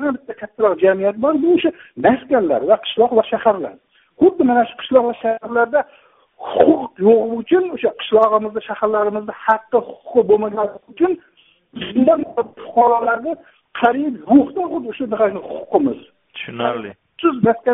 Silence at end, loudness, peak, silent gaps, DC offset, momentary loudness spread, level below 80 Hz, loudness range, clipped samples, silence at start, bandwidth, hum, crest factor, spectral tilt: 0 s; -17 LUFS; 0 dBFS; none; under 0.1%; 12 LU; -58 dBFS; 3 LU; under 0.1%; 0 s; 3.9 kHz; none; 16 dB; -4 dB/octave